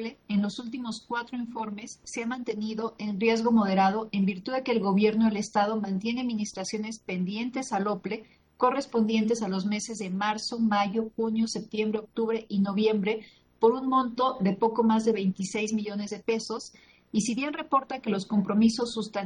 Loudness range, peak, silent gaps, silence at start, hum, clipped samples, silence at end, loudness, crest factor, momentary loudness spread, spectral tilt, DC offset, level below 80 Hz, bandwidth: 4 LU; -10 dBFS; none; 0 s; none; under 0.1%; 0 s; -28 LUFS; 18 dB; 10 LU; -5.5 dB/octave; under 0.1%; -66 dBFS; 10.5 kHz